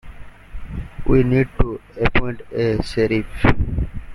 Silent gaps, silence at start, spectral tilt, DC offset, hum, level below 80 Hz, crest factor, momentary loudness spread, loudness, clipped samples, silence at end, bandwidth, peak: none; 0.05 s; -8 dB/octave; under 0.1%; none; -26 dBFS; 18 dB; 16 LU; -20 LUFS; under 0.1%; 0 s; 11.5 kHz; -2 dBFS